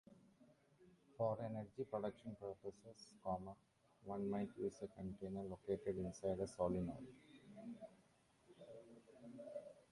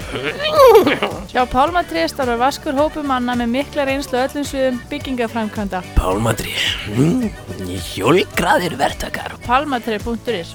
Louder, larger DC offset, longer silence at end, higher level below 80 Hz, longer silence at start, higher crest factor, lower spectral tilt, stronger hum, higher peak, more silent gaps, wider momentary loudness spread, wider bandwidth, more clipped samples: second, -47 LUFS vs -17 LUFS; neither; about the same, 0.1 s vs 0 s; second, -70 dBFS vs -32 dBFS; about the same, 0.1 s vs 0 s; about the same, 20 dB vs 18 dB; first, -7.5 dB/octave vs -5 dB/octave; neither; second, -28 dBFS vs 0 dBFS; neither; first, 18 LU vs 9 LU; second, 11.5 kHz vs over 20 kHz; neither